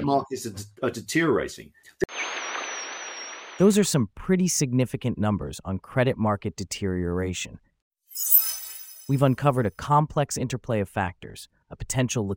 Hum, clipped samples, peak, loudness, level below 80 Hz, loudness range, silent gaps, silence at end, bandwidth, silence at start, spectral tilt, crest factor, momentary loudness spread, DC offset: none; under 0.1%; -4 dBFS; -25 LUFS; -50 dBFS; 5 LU; 7.82-7.91 s; 0 s; 17 kHz; 0 s; -5 dB/octave; 22 dB; 16 LU; under 0.1%